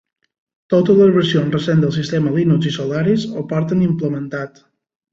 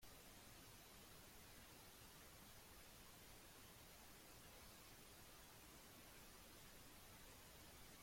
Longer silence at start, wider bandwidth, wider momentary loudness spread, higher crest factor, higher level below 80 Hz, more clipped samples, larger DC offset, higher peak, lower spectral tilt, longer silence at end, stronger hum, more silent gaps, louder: first, 0.7 s vs 0 s; second, 7.6 kHz vs 16.5 kHz; first, 10 LU vs 0 LU; about the same, 14 dB vs 16 dB; first, -54 dBFS vs -72 dBFS; neither; neither; first, -2 dBFS vs -48 dBFS; first, -7.5 dB/octave vs -2.5 dB/octave; first, 0.65 s vs 0 s; neither; neither; first, -16 LUFS vs -62 LUFS